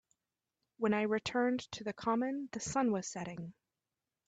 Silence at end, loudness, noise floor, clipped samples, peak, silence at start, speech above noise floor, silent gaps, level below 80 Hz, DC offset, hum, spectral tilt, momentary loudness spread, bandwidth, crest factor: 0.75 s; -36 LUFS; under -90 dBFS; under 0.1%; -20 dBFS; 0.8 s; over 55 dB; none; -72 dBFS; under 0.1%; none; -4.5 dB/octave; 10 LU; 9 kHz; 18 dB